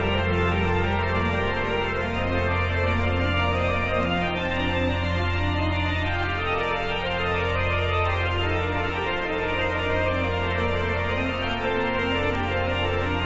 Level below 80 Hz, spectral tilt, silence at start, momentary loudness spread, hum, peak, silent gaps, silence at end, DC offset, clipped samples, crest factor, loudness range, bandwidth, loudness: -36 dBFS; -6.5 dB/octave; 0 s; 2 LU; none; -10 dBFS; none; 0 s; under 0.1%; under 0.1%; 14 dB; 1 LU; 7.8 kHz; -24 LUFS